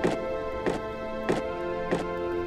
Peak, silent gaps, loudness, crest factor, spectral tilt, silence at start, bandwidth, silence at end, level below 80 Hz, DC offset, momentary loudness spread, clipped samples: -12 dBFS; none; -31 LUFS; 16 dB; -6 dB/octave; 0 s; 13 kHz; 0 s; -46 dBFS; under 0.1%; 3 LU; under 0.1%